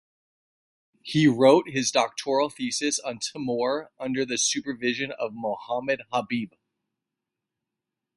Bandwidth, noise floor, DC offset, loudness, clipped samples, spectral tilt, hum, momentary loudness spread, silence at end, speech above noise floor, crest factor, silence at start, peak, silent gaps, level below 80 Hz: 11.5 kHz; -86 dBFS; under 0.1%; -25 LUFS; under 0.1%; -3.5 dB/octave; none; 12 LU; 1.7 s; 61 dB; 22 dB; 1.05 s; -4 dBFS; none; -68 dBFS